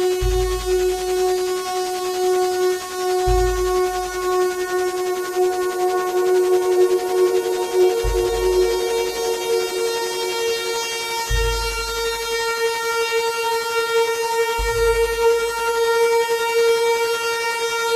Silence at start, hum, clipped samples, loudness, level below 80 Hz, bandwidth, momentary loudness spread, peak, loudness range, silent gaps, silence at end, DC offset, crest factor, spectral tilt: 0 s; none; under 0.1%; -20 LUFS; -32 dBFS; 15 kHz; 5 LU; -6 dBFS; 3 LU; none; 0 s; under 0.1%; 14 dB; -3.5 dB/octave